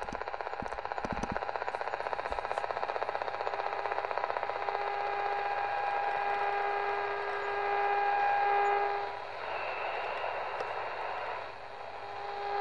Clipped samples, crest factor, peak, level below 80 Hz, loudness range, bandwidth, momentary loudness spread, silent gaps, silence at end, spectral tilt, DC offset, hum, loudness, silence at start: under 0.1%; 20 dB; -14 dBFS; -60 dBFS; 5 LU; 10.5 kHz; 9 LU; none; 0 s; -4.5 dB/octave; 0.3%; none; -34 LUFS; 0 s